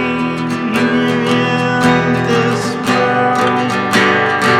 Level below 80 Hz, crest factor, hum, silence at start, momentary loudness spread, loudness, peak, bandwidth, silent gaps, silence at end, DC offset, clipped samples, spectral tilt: -48 dBFS; 12 dB; none; 0 s; 5 LU; -13 LUFS; 0 dBFS; 15.5 kHz; none; 0 s; under 0.1%; under 0.1%; -5 dB/octave